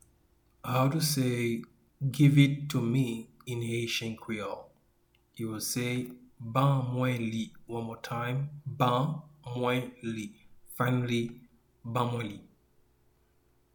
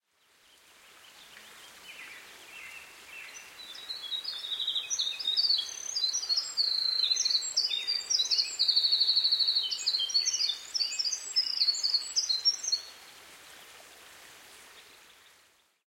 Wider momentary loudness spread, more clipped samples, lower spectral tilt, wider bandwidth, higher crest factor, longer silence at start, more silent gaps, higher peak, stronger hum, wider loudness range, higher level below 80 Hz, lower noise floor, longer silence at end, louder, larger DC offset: second, 14 LU vs 22 LU; neither; first, -6 dB/octave vs 4 dB/octave; first, 19 kHz vs 16 kHz; about the same, 22 dB vs 20 dB; second, 0.65 s vs 0.9 s; neither; first, -10 dBFS vs -14 dBFS; neither; second, 7 LU vs 16 LU; first, -64 dBFS vs -80 dBFS; about the same, -68 dBFS vs -66 dBFS; first, 1.3 s vs 1.05 s; second, -31 LUFS vs -27 LUFS; neither